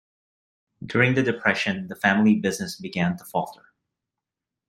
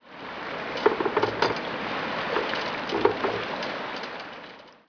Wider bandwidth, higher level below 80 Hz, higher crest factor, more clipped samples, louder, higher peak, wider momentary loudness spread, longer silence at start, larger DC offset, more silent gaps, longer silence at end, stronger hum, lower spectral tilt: first, 15.5 kHz vs 5.4 kHz; about the same, -62 dBFS vs -60 dBFS; about the same, 22 dB vs 24 dB; neither; first, -23 LUFS vs -28 LUFS; about the same, -2 dBFS vs -4 dBFS; about the same, 11 LU vs 12 LU; first, 0.8 s vs 0.05 s; neither; neither; first, 1.15 s vs 0.15 s; neither; about the same, -5.5 dB/octave vs -5 dB/octave